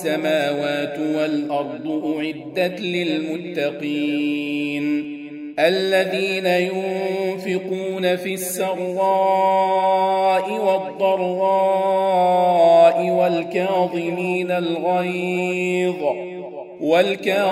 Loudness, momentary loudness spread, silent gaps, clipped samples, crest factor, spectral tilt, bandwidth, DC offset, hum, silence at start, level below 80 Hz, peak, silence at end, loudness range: -20 LUFS; 8 LU; none; under 0.1%; 16 dB; -5 dB/octave; 16 kHz; under 0.1%; none; 0 s; -72 dBFS; -2 dBFS; 0 s; 6 LU